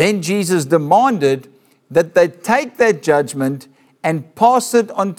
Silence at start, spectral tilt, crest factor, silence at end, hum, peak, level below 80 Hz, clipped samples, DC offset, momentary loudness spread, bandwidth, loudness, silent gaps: 0 s; -5 dB/octave; 14 dB; 0.05 s; none; -2 dBFS; -62 dBFS; under 0.1%; under 0.1%; 9 LU; 17 kHz; -16 LUFS; none